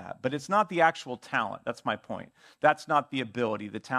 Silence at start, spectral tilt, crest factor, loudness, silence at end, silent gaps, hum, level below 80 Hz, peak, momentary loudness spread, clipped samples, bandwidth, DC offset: 0 s; -5 dB/octave; 22 dB; -28 LUFS; 0 s; none; none; -74 dBFS; -8 dBFS; 11 LU; under 0.1%; 13 kHz; under 0.1%